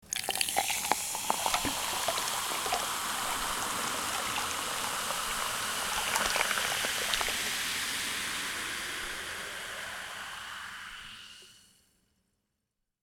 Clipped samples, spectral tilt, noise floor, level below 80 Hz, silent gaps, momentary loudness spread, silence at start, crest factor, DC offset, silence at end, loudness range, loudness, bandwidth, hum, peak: under 0.1%; 0 dB/octave; -84 dBFS; -58 dBFS; none; 11 LU; 0.05 s; 28 dB; under 0.1%; 1.45 s; 10 LU; -31 LUFS; 19.5 kHz; none; -6 dBFS